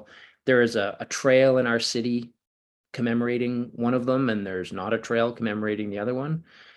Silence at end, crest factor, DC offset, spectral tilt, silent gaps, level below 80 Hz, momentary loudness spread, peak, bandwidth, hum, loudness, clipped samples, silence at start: 0.35 s; 18 dB; under 0.1%; -5 dB/octave; 2.47-2.84 s; -68 dBFS; 11 LU; -6 dBFS; 12 kHz; none; -25 LUFS; under 0.1%; 0 s